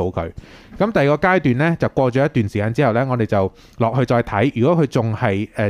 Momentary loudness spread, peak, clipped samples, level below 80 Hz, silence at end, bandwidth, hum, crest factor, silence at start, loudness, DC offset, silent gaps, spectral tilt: 6 LU; -2 dBFS; under 0.1%; -44 dBFS; 0 s; 12 kHz; none; 16 dB; 0 s; -18 LUFS; under 0.1%; none; -8 dB/octave